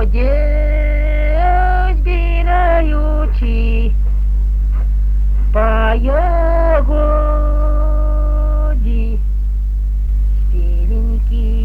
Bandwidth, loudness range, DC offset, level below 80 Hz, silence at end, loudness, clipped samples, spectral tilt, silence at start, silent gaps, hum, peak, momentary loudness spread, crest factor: 3.4 kHz; 3 LU; under 0.1%; -12 dBFS; 0 s; -16 LUFS; under 0.1%; -9 dB/octave; 0 s; none; 50 Hz at -15 dBFS; 0 dBFS; 4 LU; 12 dB